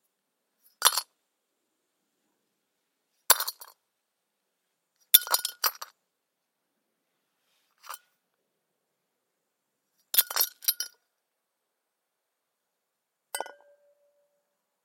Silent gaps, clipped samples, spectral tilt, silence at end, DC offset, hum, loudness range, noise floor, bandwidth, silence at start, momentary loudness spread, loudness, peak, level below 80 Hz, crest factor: none; under 0.1%; 4 dB/octave; 1.4 s; under 0.1%; none; 19 LU; -83 dBFS; 17 kHz; 0.8 s; 24 LU; -24 LUFS; 0 dBFS; -86 dBFS; 34 dB